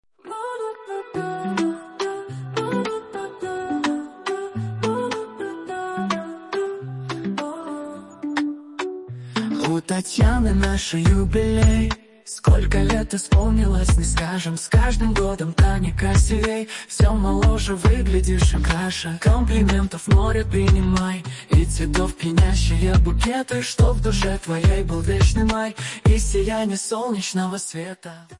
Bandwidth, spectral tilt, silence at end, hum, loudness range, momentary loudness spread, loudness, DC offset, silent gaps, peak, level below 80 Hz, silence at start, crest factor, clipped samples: 11.5 kHz; -5.5 dB/octave; 0.05 s; none; 8 LU; 12 LU; -21 LUFS; under 0.1%; none; -6 dBFS; -24 dBFS; 0.25 s; 14 dB; under 0.1%